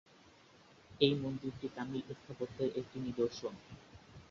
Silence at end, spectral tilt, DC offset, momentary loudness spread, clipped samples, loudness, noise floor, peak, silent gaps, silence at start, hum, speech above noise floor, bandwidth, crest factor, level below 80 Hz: 0.05 s; -5 dB/octave; under 0.1%; 23 LU; under 0.1%; -38 LUFS; -63 dBFS; -12 dBFS; none; 0.25 s; none; 25 dB; 7.6 kHz; 26 dB; -68 dBFS